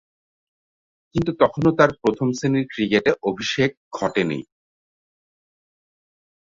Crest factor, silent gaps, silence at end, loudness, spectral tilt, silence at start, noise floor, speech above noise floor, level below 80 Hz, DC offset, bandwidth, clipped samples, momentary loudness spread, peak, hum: 22 dB; 3.77-3.91 s; 2.15 s; -21 LUFS; -6 dB/octave; 1.15 s; under -90 dBFS; over 70 dB; -54 dBFS; under 0.1%; 7.6 kHz; under 0.1%; 8 LU; -2 dBFS; none